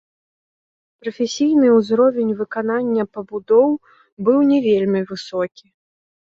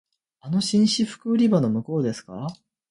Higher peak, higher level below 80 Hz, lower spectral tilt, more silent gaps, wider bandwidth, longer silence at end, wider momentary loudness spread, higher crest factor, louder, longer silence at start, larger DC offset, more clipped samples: about the same, -4 dBFS vs -6 dBFS; about the same, -64 dBFS vs -62 dBFS; about the same, -6 dB/octave vs -6 dB/octave; first, 4.12-4.17 s vs none; second, 7.8 kHz vs 11.5 kHz; first, 0.85 s vs 0.35 s; about the same, 12 LU vs 14 LU; about the same, 16 dB vs 16 dB; first, -18 LUFS vs -22 LUFS; first, 1.05 s vs 0.45 s; neither; neither